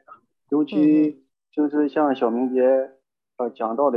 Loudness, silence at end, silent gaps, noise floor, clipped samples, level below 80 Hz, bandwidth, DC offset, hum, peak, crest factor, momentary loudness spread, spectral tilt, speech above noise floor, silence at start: -21 LUFS; 0 s; none; -51 dBFS; under 0.1%; -76 dBFS; 5.2 kHz; under 0.1%; none; -8 dBFS; 14 dB; 12 LU; -9 dB/octave; 31 dB; 0.5 s